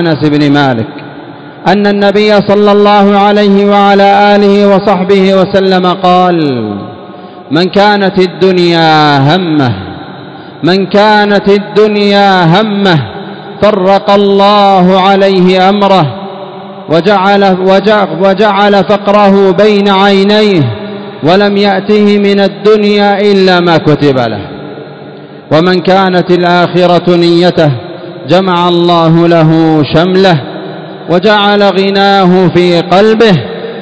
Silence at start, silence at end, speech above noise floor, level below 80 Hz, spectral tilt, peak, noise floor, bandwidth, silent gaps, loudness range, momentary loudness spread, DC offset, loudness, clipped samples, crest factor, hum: 0 s; 0 s; 21 dB; -44 dBFS; -7 dB/octave; 0 dBFS; -27 dBFS; 8 kHz; none; 3 LU; 15 LU; under 0.1%; -6 LUFS; 7%; 6 dB; none